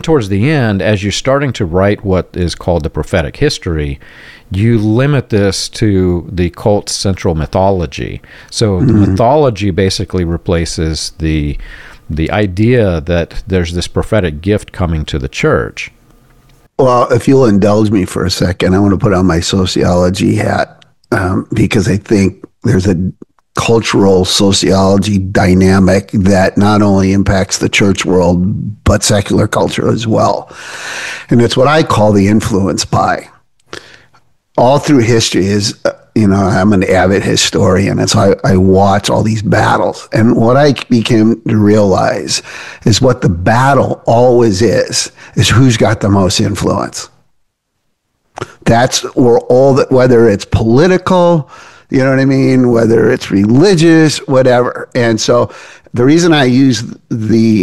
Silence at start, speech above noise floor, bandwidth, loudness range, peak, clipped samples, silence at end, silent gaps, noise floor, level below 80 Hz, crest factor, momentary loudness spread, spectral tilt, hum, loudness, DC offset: 0 s; 56 dB; 12.5 kHz; 5 LU; 0 dBFS; under 0.1%; 0 s; none; -66 dBFS; -32 dBFS; 10 dB; 9 LU; -5.5 dB/octave; none; -11 LUFS; 0.9%